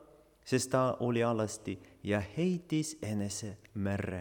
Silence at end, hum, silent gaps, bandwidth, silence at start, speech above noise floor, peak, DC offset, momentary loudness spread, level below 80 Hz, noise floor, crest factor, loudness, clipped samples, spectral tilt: 0 s; none; none; 19 kHz; 0 s; 23 dB; -16 dBFS; under 0.1%; 11 LU; -66 dBFS; -56 dBFS; 18 dB; -34 LUFS; under 0.1%; -5.5 dB/octave